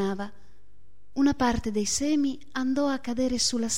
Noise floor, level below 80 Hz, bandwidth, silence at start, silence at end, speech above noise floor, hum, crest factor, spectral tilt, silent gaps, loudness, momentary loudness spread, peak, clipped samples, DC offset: -61 dBFS; -48 dBFS; 15.5 kHz; 0 s; 0 s; 34 dB; none; 16 dB; -3.5 dB/octave; none; -27 LUFS; 8 LU; -12 dBFS; under 0.1%; 1%